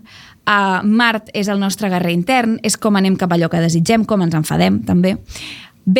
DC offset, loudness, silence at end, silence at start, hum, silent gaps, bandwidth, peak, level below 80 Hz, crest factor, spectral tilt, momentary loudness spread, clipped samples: under 0.1%; -16 LUFS; 0 s; 0.15 s; none; none; 16.5 kHz; 0 dBFS; -48 dBFS; 16 dB; -5.5 dB/octave; 8 LU; under 0.1%